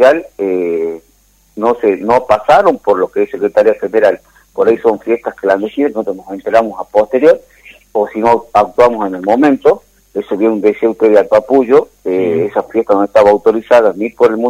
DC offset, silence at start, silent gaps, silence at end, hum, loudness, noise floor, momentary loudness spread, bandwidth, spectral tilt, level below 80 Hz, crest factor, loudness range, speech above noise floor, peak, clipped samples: under 0.1%; 0 s; none; 0 s; none; -12 LUFS; -51 dBFS; 9 LU; 13 kHz; -6.5 dB/octave; -50 dBFS; 12 dB; 3 LU; 40 dB; 0 dBFS; 0.4%